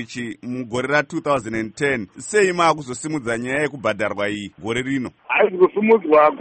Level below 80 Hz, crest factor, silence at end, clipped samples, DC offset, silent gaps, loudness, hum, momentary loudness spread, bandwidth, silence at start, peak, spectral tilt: -56 dBFS; 16 dB; 0 s; under 0.1%; under 0.1%; none; -20 LUFS; none; 12 LU; 8.8 kHz; 0 s; -4 dBFS; -5 dB/octave